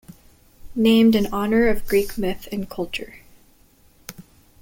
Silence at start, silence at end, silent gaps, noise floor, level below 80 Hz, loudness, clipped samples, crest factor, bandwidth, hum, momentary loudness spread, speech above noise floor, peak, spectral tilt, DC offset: 0.1 s; 0.4 s; none; -55 dBFS; -40 dBFS; -20 LUFS; under 0.1%; 16 dB; 17 kHz; none; 24 LU; 35 dB; -6 dBFS; -5.5 dB/octave; under 0.1%